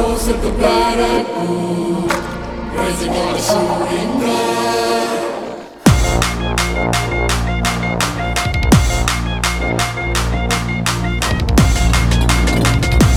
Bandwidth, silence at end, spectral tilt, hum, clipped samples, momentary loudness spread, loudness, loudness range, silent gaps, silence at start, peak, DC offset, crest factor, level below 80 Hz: 17 kHz; 0 s; -5 dB/octave; none; under 0.1%; 6 LU; -16 LUFS; 2 LU; none; 0 s; 0 dBFS; under 0.1%; 16 dB; -22 dBFS